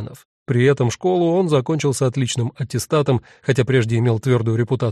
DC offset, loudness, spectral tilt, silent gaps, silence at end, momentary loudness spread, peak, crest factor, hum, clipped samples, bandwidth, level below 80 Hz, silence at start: under 0.1%; -19 LUFS; -6.5 dB/octave; 0.25-0.46 s; 0 s; 6 LU; -4 dBFS; 14 dB; none; under 0.1%; 13 kHz; -52 dBFS; 0 s